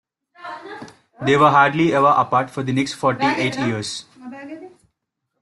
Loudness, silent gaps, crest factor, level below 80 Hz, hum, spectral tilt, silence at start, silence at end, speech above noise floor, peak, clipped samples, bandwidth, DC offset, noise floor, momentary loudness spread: -18 LUFS; none; 18 dB; -60 dBFS; none; -5.5 dB/octave; 0.4 s; 0.75 s; 59 dB; -2 dBFS; under 0.1%; 12 kHz; under 0.1%; -77 dBFS; 23 LU